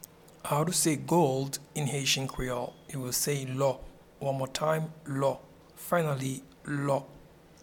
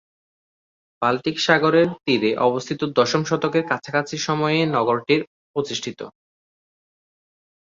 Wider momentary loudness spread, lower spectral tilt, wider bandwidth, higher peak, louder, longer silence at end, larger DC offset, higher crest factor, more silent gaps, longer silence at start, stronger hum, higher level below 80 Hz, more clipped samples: first, 13 LU vs 10 LU; about the same, -4 dB/octave vs -5 dB/octave; first, 19 kHz vs 7.6 kHz; second, -12 dBFS vs -2 dBFS; second, -30 LUFS vs -21 LUFS; second, 0.4 s vs 1.65 s; neither; about the same, 18 dB vs 20 dB; second, none vs 5.27-5.54 s; second, 0.45 s vs 1 s; neither; first, -56 dBFS vs -64 dBFS; neither